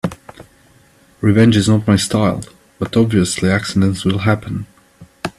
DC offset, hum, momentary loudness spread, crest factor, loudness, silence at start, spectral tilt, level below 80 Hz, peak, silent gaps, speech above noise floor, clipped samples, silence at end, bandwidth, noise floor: under 0.1%; none; 16 LU; 16 dB; -15 LUFS; 0.05 s; -6 dB/octave; -46 dBFS; 0 dBFS; none; 36 dB; under 0.1%; 0.1 s; 13 kHz; -50 dBFS